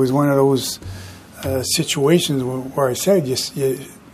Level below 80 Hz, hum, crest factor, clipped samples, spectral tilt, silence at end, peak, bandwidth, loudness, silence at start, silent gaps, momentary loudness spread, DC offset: -50 dBFS; none; 18 dB; under 0.1%; -5 dB/octave; 0.2 s; -2 dBFS; 15.5 kHz; -18 LUFS; 0 s; none; 14 LU; under 0.1%